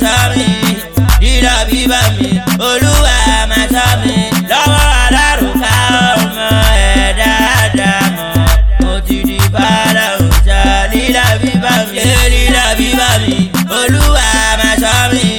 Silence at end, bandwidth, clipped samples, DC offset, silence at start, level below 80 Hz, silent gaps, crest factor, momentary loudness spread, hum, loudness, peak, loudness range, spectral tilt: 0 s; 17.5 kHz; under 0.1%; under 0.1%; 0 s; -14 dBFS; none; 10 dB; 4 LU; none; -10 LUFS; 0 dBFS; 1 LU; -4 dB/octave